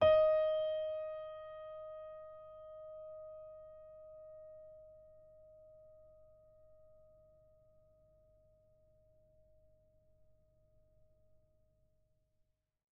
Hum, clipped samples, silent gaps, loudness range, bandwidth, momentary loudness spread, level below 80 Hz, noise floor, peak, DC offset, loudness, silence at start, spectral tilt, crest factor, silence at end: none; under 0.1%; none; 26 LU; 5.2 kHz; 28 LU; -70 dBFS; -80 dBFS; -18 dBFS; under 0.1%; -38 LUFS; 0 s; -2.5 dB/octave; 24 dB; 7.05 s